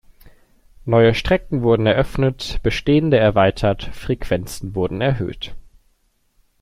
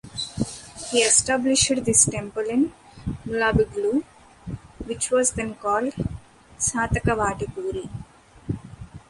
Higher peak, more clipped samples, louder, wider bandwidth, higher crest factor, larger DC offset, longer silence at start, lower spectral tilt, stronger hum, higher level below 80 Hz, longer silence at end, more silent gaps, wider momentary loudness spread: about the same, -2 dBFS vs -2 dBFS; neither; first, -18 LUFS vs -22 LUFS; first, 15.5 kHz vs 11.5 kHz; about the same, 18 dB vs 22 dB; neither; first, 0.25 s vs 0.05 s; first, -6.5 dB/octave vs -3 dB/octave; neither; first, -34 dBFS vs -42 dBFS; first, 0.95 s vs 0.1 s; neither; second, 12 LU vs 20 LU